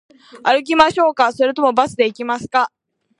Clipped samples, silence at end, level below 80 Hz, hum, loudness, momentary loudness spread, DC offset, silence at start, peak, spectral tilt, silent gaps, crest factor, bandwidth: under 0.1%; 0.5 s; -54 dBFS; none; -16 LUFS; 8 LU; under 0.1%; 0.35 s; 0 dBFS; -4 dB/octave; none; 16 dB; 11 kHz